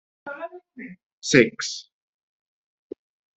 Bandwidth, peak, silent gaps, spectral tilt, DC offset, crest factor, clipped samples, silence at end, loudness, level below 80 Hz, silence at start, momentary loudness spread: 8.2 kHz; -2 dBFS; 1.03-1.22 s; -4 dB/octave; under 0.1%; 26 dB; under 0.1%; 1.55 s; -21 LUFS; -64 dBFS; 0.25 s; 26 LU